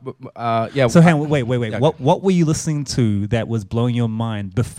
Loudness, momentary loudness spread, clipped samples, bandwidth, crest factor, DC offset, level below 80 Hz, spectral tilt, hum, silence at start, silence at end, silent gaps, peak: -18 LUFS; 10 LU; under 0.1%; 13 kHz; 18 dB; under 0.1%; -46 dBFS; -6.5 dB/octave; none; 0.05 s; 0 s; none; 0 dBFS